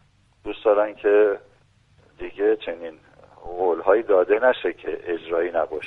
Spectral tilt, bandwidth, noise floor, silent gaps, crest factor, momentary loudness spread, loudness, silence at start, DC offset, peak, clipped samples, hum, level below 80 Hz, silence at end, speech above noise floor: -6.5 dB/octave; 4.1 kHz; -58 dBFS; none; 18 dB; 17 LU; -22 LUFS; 0.45 s; under 0.1%; -4 dBFS; under 0.1%; none; -54 dBFS; 0 s; 37 dB